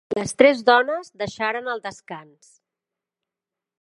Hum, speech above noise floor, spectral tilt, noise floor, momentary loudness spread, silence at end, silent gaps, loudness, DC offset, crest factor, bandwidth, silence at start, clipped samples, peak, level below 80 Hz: none; 66 dB; -4 dB/octave; -88 dBFS; 21 LU; 1.6 s; none; -20 LUFS; under 0.1%; 22 dB; 11.5 kHz; 0.1 s; under 0.1%; 0 dBFS; -62 dBFS